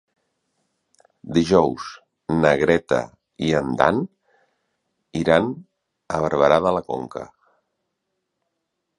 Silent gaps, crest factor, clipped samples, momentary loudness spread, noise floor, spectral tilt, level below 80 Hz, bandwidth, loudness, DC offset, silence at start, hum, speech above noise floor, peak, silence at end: none; 22 dB; under 0.1%; 18 LU; -78 dBFS; -6 dB/octave; -50 dBFS; 11 kHz; -20 LUFS; under 0.1%; 1.25 s; none; 58 dB; 0 dBFS; 1.7 s